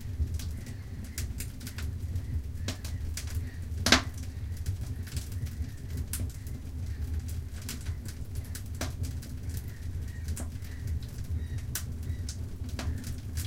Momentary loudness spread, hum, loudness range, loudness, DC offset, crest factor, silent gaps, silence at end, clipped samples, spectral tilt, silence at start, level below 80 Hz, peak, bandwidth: 5 LU; none; 6 LU; -35 LUFS; under 0.1%; 32 dB; none; 0 s; under 0.1%; -4 dB/octave; 0 s; -38 dBFS; -4 dBFS; 17 kHz